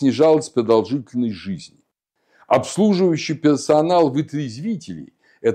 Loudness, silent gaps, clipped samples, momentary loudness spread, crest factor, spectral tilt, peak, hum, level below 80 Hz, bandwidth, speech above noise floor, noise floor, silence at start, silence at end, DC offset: -19 LUFS; none; under 0.1%; 14 LU; 16 dB; -6 dB/octave; -2 dBFS; none; -64 dBFS; 10.5 kHz; 52 dB; -70 dBFS; 0 s; 0 s; under 0.1%